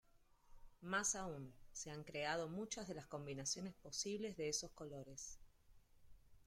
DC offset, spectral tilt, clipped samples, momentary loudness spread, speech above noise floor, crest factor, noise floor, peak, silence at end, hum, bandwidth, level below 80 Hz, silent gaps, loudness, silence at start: under 0.1%; -2.5 dB/octave; under 0.1%; 13 LU; 23 dB; 20 dB; -70 dBFS; -28 dBFS; 0.05 s; none; 16 kHz; -68 dBFS; none; -46 LUFS; 0.15 s